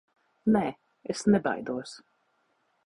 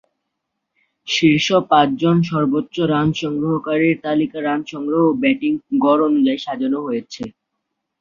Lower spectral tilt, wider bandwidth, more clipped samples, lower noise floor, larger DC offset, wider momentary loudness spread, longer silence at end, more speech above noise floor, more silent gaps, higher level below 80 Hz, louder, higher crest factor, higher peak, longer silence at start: about the same, -6 dB/octave vs -6 dB/octave; first, 11 kHz vs 7.4 kHz; neither; second, -72 dBFS vs -77 dBFS; neither; first, 14 LU vs 8 LU; first, 0.9 s vs 0.7 s; second, 45 dB vs 60 dB; neither; about the same, -62 dBFS vs -58 dBFS; second, -28 LUFS vs -18 LUFS; about the same, 18 dB vs 16 dB; second, -12 dBFS vs -2 dBFS; second, 0.45 s vs 1.05 s